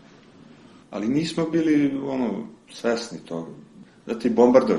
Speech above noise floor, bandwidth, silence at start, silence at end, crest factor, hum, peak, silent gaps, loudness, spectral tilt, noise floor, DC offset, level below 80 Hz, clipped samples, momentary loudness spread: 27 dB; 11 kHz; 0.9 s; 0 s; 22 dB; none; -2 dBFS; none; -23 LUFS; -6.5 dB/octave; -49 dBFS; under 0.1%; -62 dBFS; under 0.1%; 17 LU